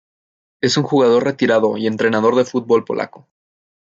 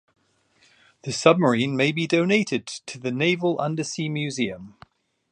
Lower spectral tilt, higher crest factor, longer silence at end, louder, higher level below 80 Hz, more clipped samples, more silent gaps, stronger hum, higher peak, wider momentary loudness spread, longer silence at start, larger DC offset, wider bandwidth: about the same, -5 dB/octave vs -5 dB/octave; second, 16 dB vs 22 dB; about the same, 0.75 s vs 0.65 s; first, -16 LUFS vs -23 LUFS; about the same, -64 dBFS vs -66 dBFS; neither; neither; neither; about the same, -2 dBFS vs -2 dBFS; second, 9 LU vs 12 LU; second, 0.65 s vs 1.05 s; neither; second, 7.8 kHz vs 10.5 kHz